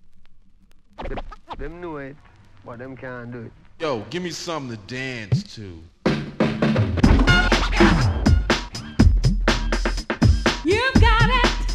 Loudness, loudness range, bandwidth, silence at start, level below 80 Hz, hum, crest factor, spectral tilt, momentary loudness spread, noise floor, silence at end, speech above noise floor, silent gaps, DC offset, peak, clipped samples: -20 LUFS; 16 LU; 11 kHz; 0.05 s; -26 dBFS; none; 20 dB; -5.5 dB/octave; 20 LU; -48 dBFS; 0 s; 19 dB; none; under 0.1%; -2 dBFS; under 0.1%